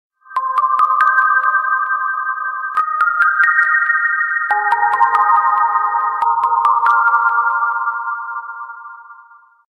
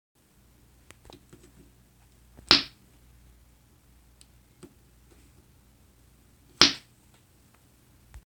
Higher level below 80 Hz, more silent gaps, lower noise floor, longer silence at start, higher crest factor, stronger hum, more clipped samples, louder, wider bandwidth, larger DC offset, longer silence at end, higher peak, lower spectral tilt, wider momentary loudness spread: second, -74 dBFS vs -56 dBFS; neither; second, -45 dBFS vs -60 dBFS; second, 0.3 s vs 2.5 s; second, 16 dB vs 34 dB; neither; neither; first, -14 LUFS vs -21 LUFS; second, 11 kHz vs 20 kHz; neither; first, 0.55 s vs 0.05 s; about the same, 0 dBFS vs 0 dBFS; about the same, -1 dB/octave vs -1.5 dB/octave; second, 11 LU vs 20 LU